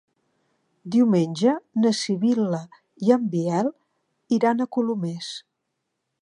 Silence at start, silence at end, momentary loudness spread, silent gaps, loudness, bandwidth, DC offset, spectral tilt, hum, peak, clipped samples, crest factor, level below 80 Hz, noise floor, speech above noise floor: 0.85 s; 0.85 s; 10 LU; none; -23 LUFS; 10.5 kHz; under 0.1%; -6.5 dB/octave; none; -4 dBFS; under 0.1%; 20 dB; -76 dBFS; -79 dBFS; 57 dB